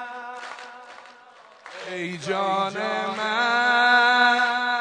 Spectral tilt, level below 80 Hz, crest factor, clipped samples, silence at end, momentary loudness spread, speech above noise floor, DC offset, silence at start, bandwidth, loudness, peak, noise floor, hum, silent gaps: -3 dB/octave; -80 dBFS; 18 dB; under 0.1%; 0 s; 22 LU; 24 dB; under 0.1%; 0 s; 10 kHz; -21 LUFS; -6 dBFS; -50 dBFS; none; none